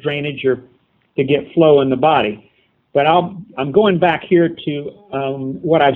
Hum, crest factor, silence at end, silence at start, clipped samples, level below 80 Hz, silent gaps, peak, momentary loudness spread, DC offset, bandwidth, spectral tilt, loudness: none; 16 dB; 0 s; 0.05 s; under 0.1%; -54 dBFS; none; 0 dBFS; 12 LU; under 0.1%; 4.1 kHz; -9.5 dB/octave; -16 LUFS